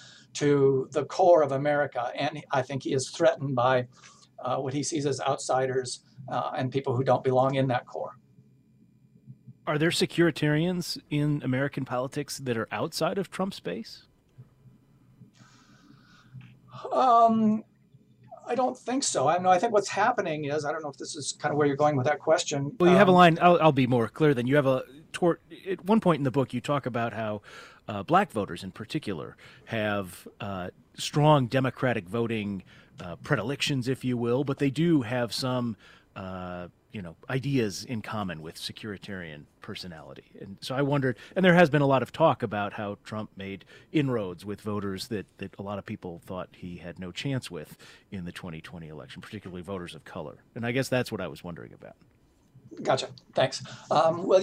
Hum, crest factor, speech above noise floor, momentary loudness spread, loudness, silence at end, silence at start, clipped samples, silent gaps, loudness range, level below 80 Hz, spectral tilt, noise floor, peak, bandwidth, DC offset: none; 22 dB; 33 dB; 19 LU; -27 LUFS; 0 s; 0 s; under 0.1%; none; 13 LU; -64 dBFS; -5.5 dB/octave; -60 dBFS; -6 dBFS; 16 kHz; under 0.1%